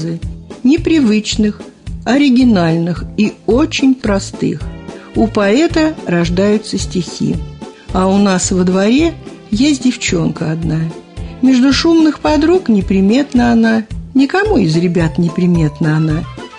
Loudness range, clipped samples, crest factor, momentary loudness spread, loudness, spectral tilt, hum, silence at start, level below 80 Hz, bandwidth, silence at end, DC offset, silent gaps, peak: 3 LU; under 0.1%; 10 dB; 11 LU; -13 LUFS; -6 dB/octave; none; 0 s; -30 dBFS; 10.5 kHz; 0 s; under 0.1%; none; -2 dBFS